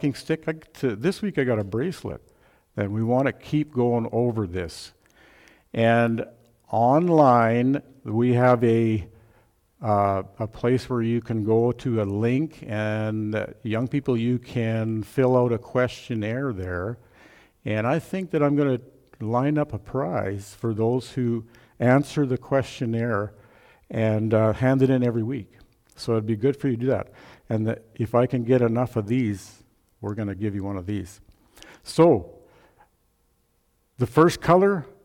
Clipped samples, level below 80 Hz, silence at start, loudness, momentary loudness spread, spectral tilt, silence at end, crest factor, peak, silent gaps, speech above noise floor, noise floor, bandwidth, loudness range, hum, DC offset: under 0.1%; -56 dBFS; 0 s; -24 LUFS; 13 LU; -8 dB/octave; 0.15 s; 18 dB; -6 dBFS; none; 45 dB; -68 dBFS; 15.5 kHz; 5 LU; none; under 0.1%